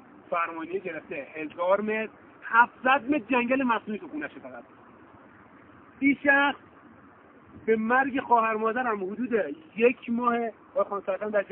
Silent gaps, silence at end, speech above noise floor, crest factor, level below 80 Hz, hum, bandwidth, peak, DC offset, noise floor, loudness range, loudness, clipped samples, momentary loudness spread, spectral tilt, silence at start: none; 0.05 s; 27 dB; 22 dB; -70 dBFS; none; 3.9 kHz; -6 dBFS; under 0.1%; -53 dBFS; 3 LU; -26 LUFS; under 0.1%; 14 LU; -2.5 dB/octave; 0.15 s